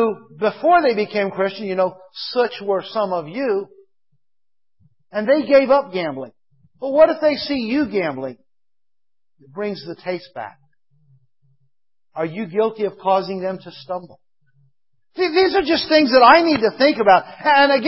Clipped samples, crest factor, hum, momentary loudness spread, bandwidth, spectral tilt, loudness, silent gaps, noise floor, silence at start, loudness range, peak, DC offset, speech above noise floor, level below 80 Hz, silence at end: under 0.1%; 20 dB; none; 17 LU; 5.8 kHz; -8.5 dB/octave; -18 LUFS; none; under -90 dBFS; 0 s; 14 LU; 0 dBFS; 0.1%; over 72 dB; -58 dBFS; 0 s